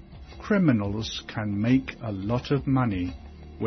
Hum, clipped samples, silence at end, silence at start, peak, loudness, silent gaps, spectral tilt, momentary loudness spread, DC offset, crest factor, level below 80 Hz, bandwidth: none; under 0.1%; 0 s; 0 s; -10 dBFS; -26 LUFS; none; -7 dB/octave; 18 LU; under 0.1%; 16 dB; -46 dBFS; 6.4 kHz